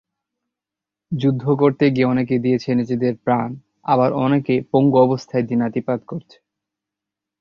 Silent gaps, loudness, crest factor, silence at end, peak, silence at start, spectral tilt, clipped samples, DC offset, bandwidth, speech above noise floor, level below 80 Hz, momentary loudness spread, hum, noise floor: none; -19 LUFS; 16 dB; 1.2 s; -2 dBFS; 1.1 s; -8.5 dB/octave; under 0.1%; under 0.1%; 7 kHz; 69 dB; -58 dBFS; 10 LU; none; -87 dBFS